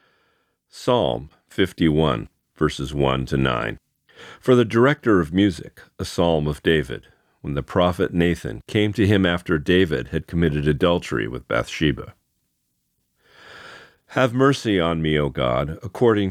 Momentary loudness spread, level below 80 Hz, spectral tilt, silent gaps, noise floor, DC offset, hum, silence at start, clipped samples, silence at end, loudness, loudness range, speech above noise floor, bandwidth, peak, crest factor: 13 LU; -40 dBFS; -6.5 dB/octave; none; -72 dBFS; under 0.1%; none; 0.75 s; under 0.1%; 0 s; -21 LUFS; 4 LU; 52 dB; 15 kHz; -4 dBFS; 18 dB